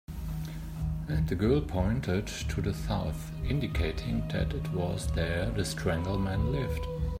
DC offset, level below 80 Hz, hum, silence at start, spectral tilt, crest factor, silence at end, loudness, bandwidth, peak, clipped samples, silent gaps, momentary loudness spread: under 0.1%; -38 dBFS; none; 0.1 s; -6.5 dB/octave; 16 dB; 0 s; -32 LUFS; 16 kHz; -14 dBFS; under 0.1%; none; 8 LU